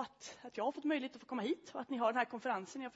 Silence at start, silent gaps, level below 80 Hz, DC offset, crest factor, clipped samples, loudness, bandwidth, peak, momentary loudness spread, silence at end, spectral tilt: 0 s; none; -84 dBFS; under 0.1%; 20 dB; under 0.1%; -39 LUFS; 7.6 kHz; -20 dBFS; 10 LU; 0.05 s; -2.5 dB/octave